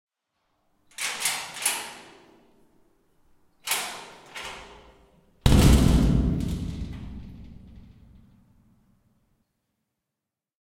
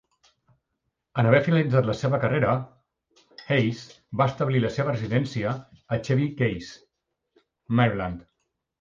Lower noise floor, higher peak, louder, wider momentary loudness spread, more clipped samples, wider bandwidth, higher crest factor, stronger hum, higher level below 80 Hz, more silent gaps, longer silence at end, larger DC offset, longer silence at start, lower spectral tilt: first, -87 dBFS vs -80 dBFS; first, -2 dBFS vs -6 dBFS; about the same, -25 LUFS vs -25 LUFS; first, 25 LU vs 14 LU; neither; first, 16.5 kHz vs 7.4 kHz; about the same, 24 dB vs 20 dB; neither; first, -32 dBFS vs -54 dBFS; neither; first, 3.15 s vs 0.6 s; neither; second, 1 s vs 1.15 s; second, -4.5 dB/octave vs -7.5 dB/octave